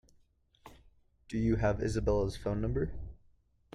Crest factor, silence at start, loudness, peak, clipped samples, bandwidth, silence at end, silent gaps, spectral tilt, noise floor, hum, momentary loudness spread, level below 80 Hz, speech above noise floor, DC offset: 18 dB; 0.65 s; -33 LUFS; -16 dBFS; under 0.1%; 12 kHz; 0.6 s; none; -7.5 dB/octave; -68 dBFS; none; 10 LU; -44 dBFS; 37 dB; under 0.1%